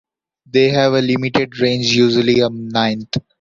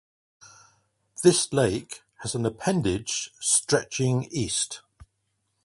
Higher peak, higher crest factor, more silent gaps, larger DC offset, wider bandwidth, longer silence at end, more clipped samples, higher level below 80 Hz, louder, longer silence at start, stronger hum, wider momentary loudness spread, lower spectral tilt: about the same, -2 dBFS vs -4 dBFS; second, 14 dB vs 22 dB; neither; neither; second, 7.6 kHz vs 11.5 kHz; second, 0.2 s vs 0.85 s; neither; about the same, -50 dBFS vs -54 dBFS; first, -16 LUFS vs -25 LUFS; second, 0.55 s vs 1.2 s; neither; second, 6 LU vs 13 LU; first, -5.5 dB/octave vs -4 dB/octave